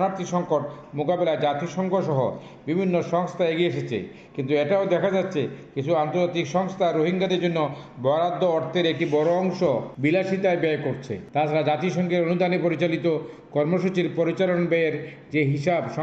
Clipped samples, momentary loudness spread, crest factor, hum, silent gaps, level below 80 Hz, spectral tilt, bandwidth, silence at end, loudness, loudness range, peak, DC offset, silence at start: under 0.1%; 7 LU; 14 dB; none; none; -64 dBFS; -7 dB/octave; 8 kHz; 0 s; -24 LUFS; 2 LU; -10 dBFS; under 0.1%; 0 s